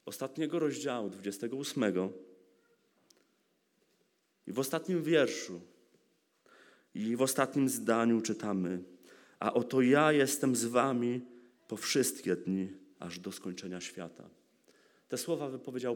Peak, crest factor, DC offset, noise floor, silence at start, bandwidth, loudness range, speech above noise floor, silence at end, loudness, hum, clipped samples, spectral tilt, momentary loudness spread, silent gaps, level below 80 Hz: -12 dBFS; 22 dB; under 0.1%; -75 dBFS; 0.05 s; 19 kHz; 10 LU; 43 dB; 0 s; -33 LUFS; none; under 0.1%; -4.5 dB/octave; 15 LU; none; -86 dBFS